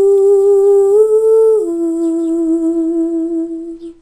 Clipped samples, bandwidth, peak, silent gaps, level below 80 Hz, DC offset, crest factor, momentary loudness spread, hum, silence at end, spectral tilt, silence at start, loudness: under 0.1%; 10.5 kHz; -2 dBFS; none; -52 dBFS; under 0.1%; 10 dB; 10 LU; none; 0.1 s; -6.5 dB/octave; 0 s; -12 LUFS